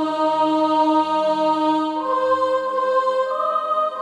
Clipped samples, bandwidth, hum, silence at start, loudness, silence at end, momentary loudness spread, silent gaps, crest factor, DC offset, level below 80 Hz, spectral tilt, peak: under 0.1%; 11 kHz; none; 0 s; -19 LUFS; 0 s; 4 LU; none; 12 dB; under 0.1%; -66 dBFS; -5 dB/octave; -8 dBFS